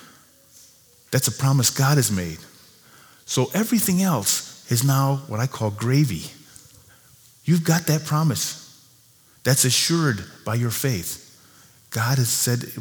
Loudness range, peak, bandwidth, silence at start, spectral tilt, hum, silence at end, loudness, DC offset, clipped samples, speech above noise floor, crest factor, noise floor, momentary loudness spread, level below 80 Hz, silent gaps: 2 LU; -2 dBFS; over 20 kHz; 1.1 s; -4 dB/octave; none; 0 s; -21 LUFS; under 0.1%; under 0.1%; 34 dB; 20 dB; -55 dBFS; 11 LU; -58 dBFS; none